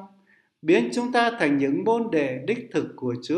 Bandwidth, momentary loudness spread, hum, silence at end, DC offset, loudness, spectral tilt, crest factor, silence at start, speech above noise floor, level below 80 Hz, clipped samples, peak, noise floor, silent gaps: 11 kHz; 8 LU; none; 0 s; under 0.1%; -24 LUFS; -5.5 dB/octave; 18 dB; 0 s; 38 dB; -72 dBFS; under 0.1%; -6 dBFS; -61 dBFS; none